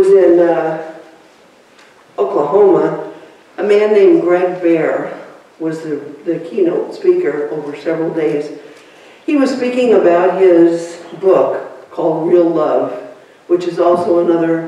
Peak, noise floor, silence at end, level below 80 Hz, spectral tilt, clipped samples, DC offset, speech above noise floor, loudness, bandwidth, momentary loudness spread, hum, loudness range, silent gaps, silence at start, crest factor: -2 dBFS; -46 dBFS; 0 s; -64 dBFS; -7 dB/octave; under 0.1%; under 0.1%; 33 dB; -13 LUFS; 10 kHz; 16 LU; none; 5 LU; none; 0 s; 12 dB